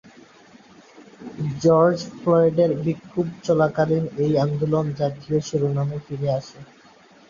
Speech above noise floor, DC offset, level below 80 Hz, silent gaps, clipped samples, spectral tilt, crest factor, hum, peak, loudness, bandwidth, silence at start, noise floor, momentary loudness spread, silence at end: 30 dB; under 0.1%; -56 dBFS; none; under 0.1%; -7.5 dB/octave; 18 dB; none; -6 dBFS; -22 LUFS; 7.4 kHz; 1 s; -51 dBFS; 10 LU; 0.65 s